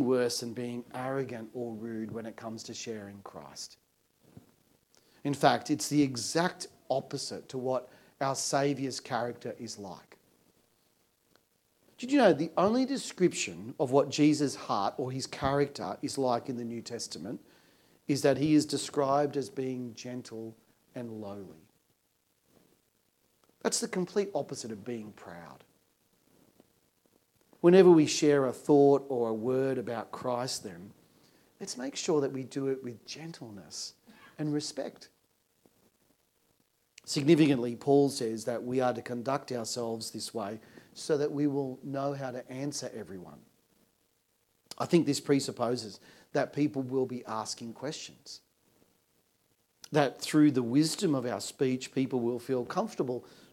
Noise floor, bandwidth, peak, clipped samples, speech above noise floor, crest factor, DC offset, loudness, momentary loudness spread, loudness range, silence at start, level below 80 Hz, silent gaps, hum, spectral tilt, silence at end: -75 dBFS; 16 kHz; -8 dBFS; under 0.1%; 44 dB; 24 dB; under 0.1%; -30 LUFS; 18 LU; 13 LU; 0 s; -72 dBFS; none; none; -5 dB/octave; 0.25 s